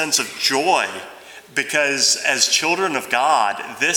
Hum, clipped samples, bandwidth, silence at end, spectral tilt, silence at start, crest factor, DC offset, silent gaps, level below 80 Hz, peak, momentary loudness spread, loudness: none; under 0.1%; over 20 kHz; 0 s; -0.5 dB/octave; 0 s; 18 dB; under 0.1%; none; -72 dBFS; -2 dBFS; 10 LU; -18 LUFS